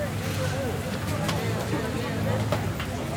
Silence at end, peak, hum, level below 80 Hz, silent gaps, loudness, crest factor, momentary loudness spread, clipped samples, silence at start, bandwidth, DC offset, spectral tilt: 0 s; -10 dBFS; none; -46 dBFS; none; -28 LUFS; 18 dB; 3 LU; under 0.1%; 0 s; over 20 kHz; under 0.1%; -5.5 dB/octave